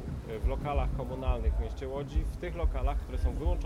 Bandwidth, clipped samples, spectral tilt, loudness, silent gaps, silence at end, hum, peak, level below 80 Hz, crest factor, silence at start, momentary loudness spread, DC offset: 11.5 kHz; under 0.1%; -8 dB/octave; -34 LUFS; none; 0 s; none; -18 dBFS; -32 dBFS; 14 dB; 0 s; 4 LU; under 0.1%